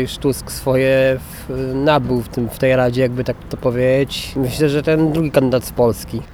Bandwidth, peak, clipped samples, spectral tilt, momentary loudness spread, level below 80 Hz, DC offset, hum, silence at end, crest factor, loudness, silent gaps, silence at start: over 20 kHz; -2 dBFS; under 0.1%; -6 dB/octave; 8 LU; -36 dBFS; under 0.1%; none; 0 s; 14 dB; -17 LUFS; none; 0 s